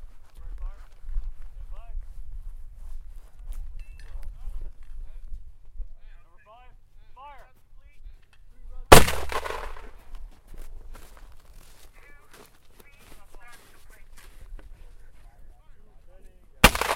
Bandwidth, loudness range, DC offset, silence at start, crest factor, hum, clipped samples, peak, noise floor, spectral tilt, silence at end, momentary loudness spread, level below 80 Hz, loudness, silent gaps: 16 kHz; 24 LU; under 0.1%; 0 s; 28 dB; none; under 0.1%; 0 dBFS; -50 dBFS; -3.5 dB/octave; 0 s; 30 LU; -34 dBFS; -20 LUFS; none